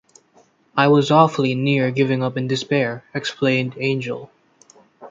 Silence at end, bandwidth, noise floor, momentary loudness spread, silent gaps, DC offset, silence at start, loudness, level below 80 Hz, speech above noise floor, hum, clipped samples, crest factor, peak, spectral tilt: 0 s; 7.8 kHz; -56 dBFS; 11 LU; none; under 0.1%; 0.75 s; -19 LUFS; -64 dBFS; 38 dB; none; under 0.1%; 18 dB; -2 dBFS; -6.5 dB/octave